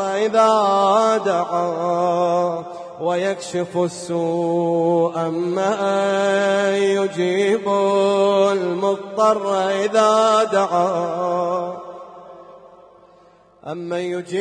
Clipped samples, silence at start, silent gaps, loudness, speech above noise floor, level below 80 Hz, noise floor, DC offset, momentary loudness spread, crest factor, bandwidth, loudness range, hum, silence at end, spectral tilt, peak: under 0.1%; 0 s; none; -19 LUFS; 33 dB; -72 dBFS; -51 dBFS; under 0.1%; 10 LU; 16 dB; 10.5 kHz; 5 LU; none; 0 s; -5 dB/octave; -4 dBFS